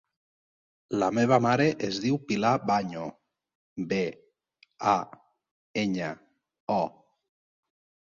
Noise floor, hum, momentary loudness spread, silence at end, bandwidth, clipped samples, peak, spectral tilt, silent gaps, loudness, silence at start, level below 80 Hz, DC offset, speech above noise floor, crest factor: -66 dBFS; none; 15 LU; 1.2 s; 7.6 kHz; under 0.1%; -8 dBFS; -6 dB/octave; 3.55-3.76 s, 5.51-5.74 s, 6.60-6.67 s; -28 LUFS; 0.9 s; -66 dBFS; under 0.1%; 39 dB; 22 dB